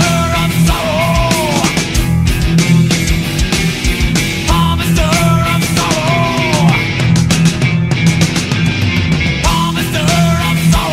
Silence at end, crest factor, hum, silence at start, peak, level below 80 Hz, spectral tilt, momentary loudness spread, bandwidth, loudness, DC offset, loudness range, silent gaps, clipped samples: 0 s; 12 dB; none; 0 s; 0 dBFS; -22 dBFS; -5 dB/octave; 3 LU; 16 kHz; -12 LUFS; under 0.1%; 1 LU; none; under 0.1%